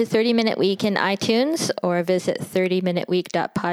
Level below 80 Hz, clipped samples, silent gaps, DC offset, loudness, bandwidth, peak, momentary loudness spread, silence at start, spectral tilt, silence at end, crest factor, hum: -62 dBFS; under 0.1%; none; under 0.1%; -21 LUFS; 15 kHz; -4 dBFS; 4 LU; 0 s; -5 dB/octave; 0 s; 16 dB; none